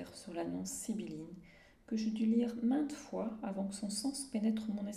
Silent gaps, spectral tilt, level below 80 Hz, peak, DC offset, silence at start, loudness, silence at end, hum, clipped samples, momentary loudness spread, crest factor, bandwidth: none; -5 dB/octave; -70 dBFS; -22 dBFS; under 0.1%; 0 s; -38 LUFS; 0 s; none; under 0.1%; 11 LU; 16 dB; 15 kHz